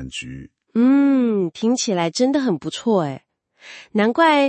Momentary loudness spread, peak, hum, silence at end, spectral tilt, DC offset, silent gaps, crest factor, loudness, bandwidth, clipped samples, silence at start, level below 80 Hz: 17 LU; -4 dBFS; none; 0 s; -5 dB/octave; under 0.1%; none; 16 dB; -19 LUFS; 8.8 kHz; under 0.1%; 0 s; -56 dBFS